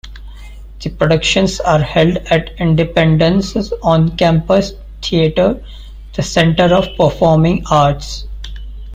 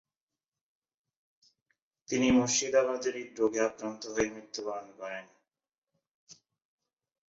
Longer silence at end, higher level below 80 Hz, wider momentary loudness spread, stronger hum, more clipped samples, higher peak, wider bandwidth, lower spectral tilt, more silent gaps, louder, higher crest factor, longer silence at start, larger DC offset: second, 0 s vs 0.95 s; first, -30 dBFS vs -64 dBFS; about the same, 15 LU vs 15 LU; neither; neither; first, 0 dBFS vs -14 dBFS; first, 9.2 kHz vs 8 kHz; first, -6 dB/octave vs -3.5 dB/octave; second, none vs 5.78-5.82 s, 6.11-6.27 s; first, -13 LUFS vs -31 LUFS; second, 14 dB vs 20 dB; second, 0.05 s vs 2.1 s; neither